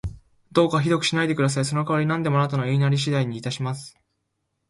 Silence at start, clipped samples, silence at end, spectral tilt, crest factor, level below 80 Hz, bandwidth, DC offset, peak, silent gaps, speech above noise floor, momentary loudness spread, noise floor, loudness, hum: 0.05 s; under 0.1%; 0.8 s; -5.5 dB/octave; 18 dB; -50 dBFS; 11.5 kHz; under 0.1%; -6 dBFS; none; 54 dB; 8 LU; -76 dBFS; -23 LUFS; none